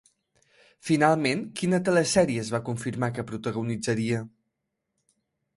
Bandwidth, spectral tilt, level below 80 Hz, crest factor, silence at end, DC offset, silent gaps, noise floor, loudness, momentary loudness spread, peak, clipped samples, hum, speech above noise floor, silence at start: 11.5 kHz; -5 dB/octave; -62 dBFS; 20 dB; 1.3 s; under 0.1%; none; -81 dBFS; -26 LUFS; 10 LU; -8 dBFS; under 0.1%; none; 56 dB; 0.85 s